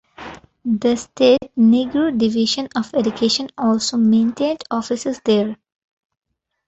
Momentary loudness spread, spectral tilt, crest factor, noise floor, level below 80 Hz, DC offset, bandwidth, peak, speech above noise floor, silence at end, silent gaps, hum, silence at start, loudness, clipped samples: 10 LU; -5 dB/octave; 16 dB; -37 dBFS; -56 dBFS; under 0.1%; 8 kHz; -2 dBFS; 20 dB; 1.15 s; none; none; 0.2 s; -18 LUFS; under 0.1%